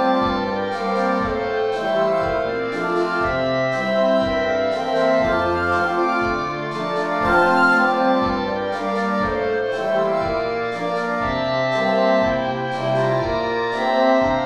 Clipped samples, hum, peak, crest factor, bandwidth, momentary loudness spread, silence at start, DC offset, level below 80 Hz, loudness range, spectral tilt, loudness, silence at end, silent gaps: under 0.1%; none; -4 dBFS; 16 dB; 12 kHz; 6 LU; 0 s; 0.2%; -44 dBFS; 3 LU; -6 dB/octave; -20 LUFS; 0 s; none